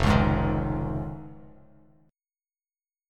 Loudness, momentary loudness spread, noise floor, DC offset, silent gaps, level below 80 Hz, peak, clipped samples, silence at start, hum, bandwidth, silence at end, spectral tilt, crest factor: -27 LUFS; 19 LU; under -90 dBFS; under 0.1%; none; -36 dBFS; -6 dBFS; under 0.1%; 0 s; none; 12.5 kHz; 1.65 s; -7.5 dB/octave; 22 dB